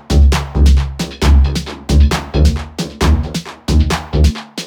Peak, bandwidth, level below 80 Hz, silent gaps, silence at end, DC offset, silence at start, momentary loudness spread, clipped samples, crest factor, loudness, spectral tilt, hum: -2 dBFS; 13.5 kHz; -14 dBFS; none; 0 s; under 0.1%; 0.1 s; 10 LU; under 0.1%; 12 dB; -15 LUFS; -6 dB/octave; none